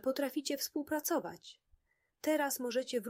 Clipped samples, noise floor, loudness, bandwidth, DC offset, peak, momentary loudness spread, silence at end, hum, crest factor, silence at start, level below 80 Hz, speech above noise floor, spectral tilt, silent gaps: under 0.1%; -72 dBFS; -36 LUFS; 16 kHz; under 0.1%; -20 dBFS; 13 LU; 0 s; none; 16 dB; 0.05 s; -78 dBFS; 36 dB; -2.5 dB/octave; none